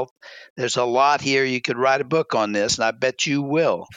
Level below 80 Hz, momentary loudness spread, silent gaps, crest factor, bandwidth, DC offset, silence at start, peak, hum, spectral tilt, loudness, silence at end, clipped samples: -60 dBFS; 6 LU; 0.11-0.16 s, 0.50-0.56 s; 14 dB; 9.6 kHz; under 0.1%; 0 s; -6 dBFS; none; -3.5 dB/octave; -20 LUFS; 0 s; under 0.1%